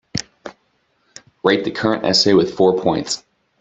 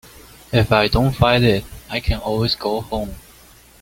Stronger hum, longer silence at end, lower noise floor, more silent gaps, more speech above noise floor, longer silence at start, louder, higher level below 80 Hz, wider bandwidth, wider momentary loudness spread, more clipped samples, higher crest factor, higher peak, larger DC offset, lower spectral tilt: neither; second, 0.45 s vs 0.6 s; first, -64 dBFS vs -47 dBFS; neither; first, 48 dB vs 29 dB; second, 0.15 s vs 0.5 s; about the same, -17 LUFS vs -19 LUFS; second, -54 dBFS vs -32 dBFS; second, 8.2 kHz vs 17 kHz; first, 19 LU vs 12 LU; neither; about the same, 18 dB vs 18 dB; about the same, 0 dBFS vs 0 dBFS; neither; second, -4 dB/octave vs -6 dB/octave